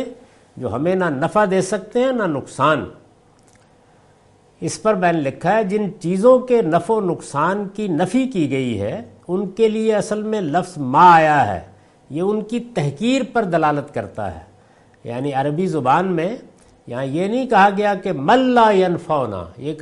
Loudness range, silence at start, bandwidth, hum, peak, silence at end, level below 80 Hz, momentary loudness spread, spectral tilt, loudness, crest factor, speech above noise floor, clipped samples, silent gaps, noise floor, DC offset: 6 LU; 0 s; 11.5 kHz; none; 0 dBFS; 0 s; -56 dBFS; 14 LU; -6 dB/octave; -18 LUFS; 18 dB; 35 dB; under 0.1%; none; -53 dBFS; under 0.1%